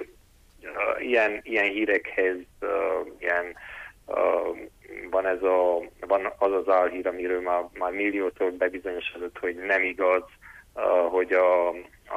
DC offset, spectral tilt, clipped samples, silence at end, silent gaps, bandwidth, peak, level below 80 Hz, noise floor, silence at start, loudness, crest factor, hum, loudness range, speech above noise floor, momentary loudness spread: under 0.1%; -5 dB/octave; under 0.1%; 0 s; none; 13.5 kHz; -10 dBFS; -58 dBFS; -56 dBFS; 0 s; -26 LUFS; 16 dB; none; 2 LU; 30 dB; 13 LU